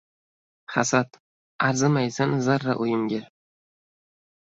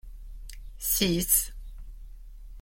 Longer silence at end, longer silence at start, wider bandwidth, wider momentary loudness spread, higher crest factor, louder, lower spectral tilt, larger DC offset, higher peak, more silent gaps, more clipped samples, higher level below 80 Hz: first, 1.2 s vs 0 s; first, 0.7 s vs 0.05 s; second, 8 kHz vs 16.5 kHz; second, 7 LU vs 24 LU; about the same, 22 dB vs 24 dB; about the same, -24 LUFS vs -25 LUFS; first, -5 dB/octave vs -3 dB/octave; neither; first, -4 dBFS vs -8 dBFS; first, 1.20-1.59 s vs none; neither; second, -64 dBFS vs -42 dBFS